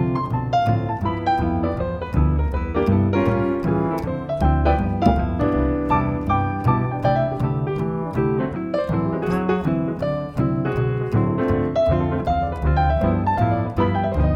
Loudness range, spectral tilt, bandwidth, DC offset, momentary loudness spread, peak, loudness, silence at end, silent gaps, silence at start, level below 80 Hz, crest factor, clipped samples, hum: 2 LU; -9.5 dB/octave; 7 kHz; under 0.1%; 5 LU; -2 dBFS; -21 LUFS; 0 s; none; 0 s; -28 dBFS; 18 dB; under 0.1%; none